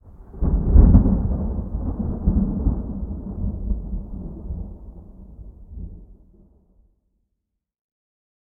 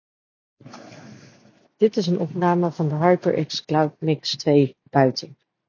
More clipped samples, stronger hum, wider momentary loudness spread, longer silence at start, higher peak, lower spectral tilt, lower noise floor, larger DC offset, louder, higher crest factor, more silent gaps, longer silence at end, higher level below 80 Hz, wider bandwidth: neither; neither; first, 26 LU vs 7 LU; second, 0.05 s vs 0.65 s; about the same, 0 dBFS vs -2 dBFS; first, -15 dB/octave vs -6.5 dB/octave; first, -79 dBFS vs -55 dBFS; neither; about the same, -22 LUFS vs -21 LUFS; about the same, 22 dB vs 20 dB; neither; first, 2.35 s vs 0.35 s; first, -24 dBFS vs -68 dBFS; second, 1.7 kHz vs 7.2 kHz